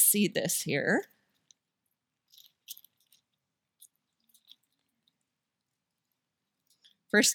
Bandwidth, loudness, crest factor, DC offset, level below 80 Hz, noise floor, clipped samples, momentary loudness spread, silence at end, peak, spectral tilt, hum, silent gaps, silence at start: 18 kHz; -28 LUFS; 24 dB; under 0.1%; -82 dBFS; -86 dBFS; under 0.1%; 23 LU; 0 s; -10 dBFS; -2.5 dB/octave; none; none; 0 s